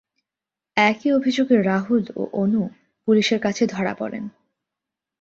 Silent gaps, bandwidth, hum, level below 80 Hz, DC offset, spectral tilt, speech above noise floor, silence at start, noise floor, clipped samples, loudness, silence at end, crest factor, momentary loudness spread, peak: none; 7.8 kHz; none; -64 dBFS; under 0.1%; -5.5 dB/octave; 68 dB; 0.75 s; -88 dBFS; under 0.1%; -21 LUFS; 0.95 s; 20 dB; 12 LU; -2 dBFS